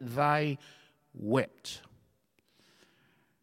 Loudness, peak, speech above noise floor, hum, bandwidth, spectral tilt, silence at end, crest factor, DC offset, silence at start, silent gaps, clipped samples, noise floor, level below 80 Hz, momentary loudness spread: -32 LUFS; -14 dBFS; 41 dB; none; 16 kHz; -6 dB/octave; 1.65 s; 22 dB; under 0.1%; 0 s; none; under 0.1%; -72 dBFS; -74 dBFS; 17 LU